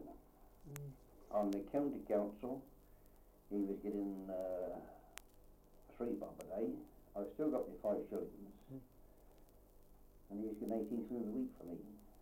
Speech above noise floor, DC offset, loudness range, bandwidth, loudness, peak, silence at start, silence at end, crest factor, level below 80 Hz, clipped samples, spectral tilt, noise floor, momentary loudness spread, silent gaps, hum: 22 dB; under 0.1%; 4 LU; 16.5 kHz; -44 LUFS; -24 dBFS; 0 s; 0 s; 22 dB; -66 dBFS; under 0.1%; -7.5 dB/octave; -65 dBFS; 17 LU; none; none